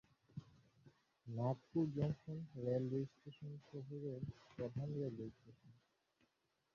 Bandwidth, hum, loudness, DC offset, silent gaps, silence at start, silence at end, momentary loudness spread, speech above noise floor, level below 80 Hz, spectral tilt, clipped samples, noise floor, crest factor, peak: 7 kHz; none; -45 LUFS; under 0.1%; none; 0.35 s; 1.05 s; 15 LU; 40 dB; -74 dBFS; -9.5 dB/octave; under 0.1%; -84 dBFS; 20 dB; -26 dBFS